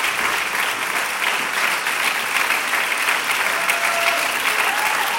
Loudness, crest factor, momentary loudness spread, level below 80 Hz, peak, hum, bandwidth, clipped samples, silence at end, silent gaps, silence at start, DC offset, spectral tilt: -18 LUFS; 18 dB; 2 LU; -62 dBFS; -2 dBFS; none; 17 kHz; under 0.1%; 0 s; none; 0 s; under 0.1%; 0.5 dB/octave